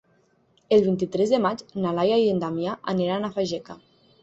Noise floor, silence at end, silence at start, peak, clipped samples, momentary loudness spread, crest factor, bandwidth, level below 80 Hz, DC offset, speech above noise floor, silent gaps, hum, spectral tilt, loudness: -63 dBFS; 0.5 s; 0.7 s; -8 dBFS; under 0.1%; 8 LU; 18 dB; 8 kHz; -62 dBFS; under 0.1%; 40 dB; none; none; -6.5 dB/octave; -24 LUFS